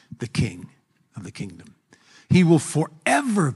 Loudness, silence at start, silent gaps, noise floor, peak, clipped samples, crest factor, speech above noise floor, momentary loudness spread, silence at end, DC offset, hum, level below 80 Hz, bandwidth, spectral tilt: -21 LUFS; 0.2 s; none; -54 dBFS; -4 dBFS; under 0.1%; 18 dB; 33 dB; 21 LU; 0 s; under 0.1%; none; -52 dBFS; 12 kHz; -6 dB/octave